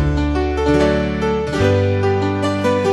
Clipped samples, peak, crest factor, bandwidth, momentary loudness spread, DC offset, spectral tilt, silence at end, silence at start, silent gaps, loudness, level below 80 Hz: under 0.1%; -2 dBFS; 14 dB; 11.5 kHz; 3 LU; under 0.1%; -7 dB/octave; 0 s; 0 s; none; -17 LUFS; -26 dBFS